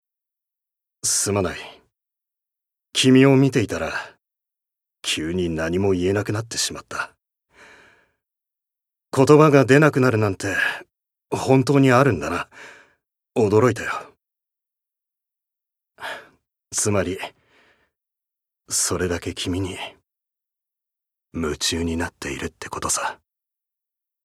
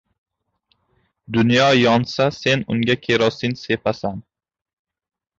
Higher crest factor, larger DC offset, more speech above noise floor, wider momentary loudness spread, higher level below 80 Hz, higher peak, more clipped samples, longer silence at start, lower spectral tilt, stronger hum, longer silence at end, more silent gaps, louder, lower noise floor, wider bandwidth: about the same, 22 dB vs 18 dB; neither; first, 65 dB vs 50 dB; first, 19 LU vs 11 LU; about the same, -54 dBFS vs -54 dBFS; first, 0 dBFS vs -4 dBFS; neither; second, 1.05 s vs 1.3 s; about the same, -4.5 dB/octave vs -5.5 dB/octave; neither; about the same, 1.1 s vs 1.2 s; neither; about the same, -20 LUFS vs -18 LUFS; first, -84 dBFS vs -68 dBFS; first, 15 kHz vs 7.8 kHz